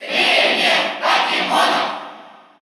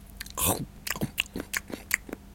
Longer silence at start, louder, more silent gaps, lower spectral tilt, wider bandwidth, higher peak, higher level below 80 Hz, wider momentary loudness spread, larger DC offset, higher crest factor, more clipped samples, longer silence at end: about the same, 0 s vs 0 s; first, -15 LUFS vs -30 LUFS; neither; about the same, -1.5 dB/octave vs -2.5 dB/octave; first, over 20 kHz vs 17 kHz; about the same, -2 dBFS vs -4 dBFS; second, -82 dBFS vs -48 dBFS; first, 11 LU vs 7 LU; neither; second, 16 dB vs 30 dB; neither; first, 0.3 s vs 0 s